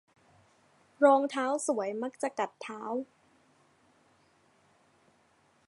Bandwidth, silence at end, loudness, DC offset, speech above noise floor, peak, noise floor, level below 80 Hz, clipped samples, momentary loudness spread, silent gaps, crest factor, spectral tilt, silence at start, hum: 11.5 kHz; 2.65 s; -30 LUFS; under 0.1%; 38 dB; -10 dBFS; -68 dBFS; -86 dBFS; under 0.1%; 14 LU; none; 24 dB; -3.5 dB/octave; 1 s; none